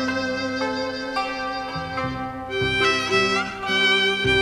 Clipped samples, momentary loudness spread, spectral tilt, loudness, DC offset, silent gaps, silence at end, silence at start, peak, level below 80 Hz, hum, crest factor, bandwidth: under 0.1%; 10 LU; -3.5 dB/octave; -22 LUFS; under 0.1%; none; 0 s; 0 s; -6 dBFS; -46 dBFS; none; 16 dB; 12.5 kHz